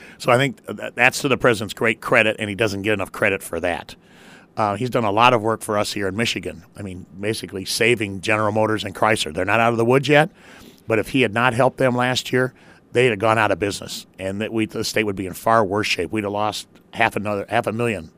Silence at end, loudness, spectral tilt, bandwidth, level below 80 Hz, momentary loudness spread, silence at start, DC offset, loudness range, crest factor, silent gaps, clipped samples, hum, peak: 0.1 s; -20 LUFS; -4.5 dB/octave; 15.5 kHz; -54 dBFS; 10 LU; 0 s; under 0.1%; 3 LU; 20 dB; none; under 0.1%; none; 0 dBFS